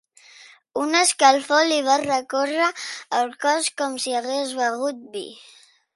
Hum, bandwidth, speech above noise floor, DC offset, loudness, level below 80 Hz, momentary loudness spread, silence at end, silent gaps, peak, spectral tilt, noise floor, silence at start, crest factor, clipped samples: none; 11.5 kHz; 27 dB; under 0.1%; -21 LUFS; -74 dBFS; 16 LU; 0.6 s; none; -2 dBFS; -0.5 dB/octave; -49 dBFS; 0.75 s; 22 dB; under 0.1%